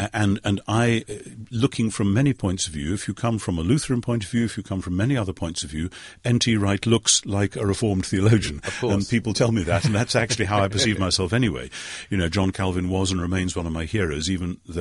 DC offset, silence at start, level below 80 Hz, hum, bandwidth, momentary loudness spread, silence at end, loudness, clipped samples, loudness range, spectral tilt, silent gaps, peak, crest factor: under 0.1%; 0 s; -42 dBFS; none; 11.5 kHz; 8 LU; 0 s; -23 LUFS; under 0.1%; 3 LU; -5 dB/octave; none; -4 dBFS; 18 dB